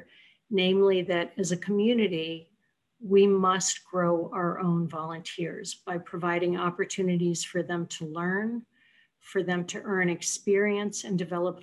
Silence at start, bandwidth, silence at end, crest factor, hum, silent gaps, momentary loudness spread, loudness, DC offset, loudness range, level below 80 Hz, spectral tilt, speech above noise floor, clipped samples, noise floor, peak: 0 s; 12 kHz; 0 s; 16 dB; none; none; 12 LU; -28 LUFS; under 0.1%; 5 LU; -74 dBFS; -4.5 dB/octave; 46 dB; under 0.1%; -73 dBFS; -12 dBFS